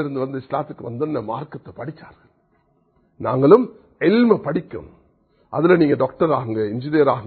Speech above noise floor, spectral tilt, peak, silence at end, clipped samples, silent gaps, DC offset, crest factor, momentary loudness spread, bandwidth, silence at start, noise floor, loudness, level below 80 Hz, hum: 43 dB; -10.5 dB/octave; 0 dBFS; 0 s; under 0.1%; none; under 0.1%; 20 dB; 19 LU; 4.5 kHz; 0 s; -62 dBFS; -19 LUFS; -56 dBFS; none